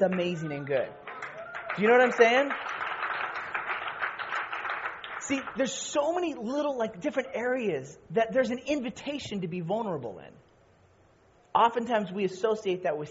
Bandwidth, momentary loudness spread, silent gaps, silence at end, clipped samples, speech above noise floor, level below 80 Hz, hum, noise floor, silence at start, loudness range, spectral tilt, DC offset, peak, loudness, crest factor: 8 kHz; 13 LU; none; 0 s; under 0.1%; 33 dB; -68 dBFS; none; -61 dBFS; 0 s; 6 LU; -3.5 dB/octave; under 0.1%; -6 dBFS; -29 LUFS; 22 dB